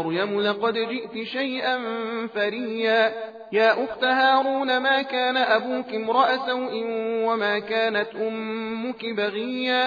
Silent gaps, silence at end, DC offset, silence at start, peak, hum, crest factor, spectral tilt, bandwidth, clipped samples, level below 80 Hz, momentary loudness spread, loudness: none; 0 s; under 0.1%; 0 s; -6 dBFS; none; 16 dB; -5.5 dB/octave; 5 kHz; under 0.1%; -72 dBFS; 8 LU; -23 LUFS